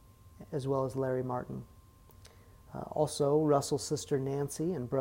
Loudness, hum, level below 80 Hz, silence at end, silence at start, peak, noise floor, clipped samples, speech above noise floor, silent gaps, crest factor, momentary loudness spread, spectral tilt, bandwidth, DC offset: -33 LUFS; none; -62 dBFS; 0 s; 0.25 s; -14 dBFS; -57 dBFS; under 0.1%; 25 dB; none; 18 dB; 14 LU; -6 dB/octave; 16 kHz; under 0.1%